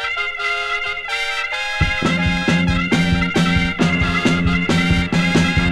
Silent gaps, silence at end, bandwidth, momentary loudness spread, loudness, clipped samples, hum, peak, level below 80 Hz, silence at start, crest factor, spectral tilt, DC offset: none; 0 s; 11.5 kHz; 4 LU; -17 LUFS; under 0.1%; none; -2 dBFS; -30 dBFS; 0 s; 14 dB; -5.5 dB/octave; under 0.1%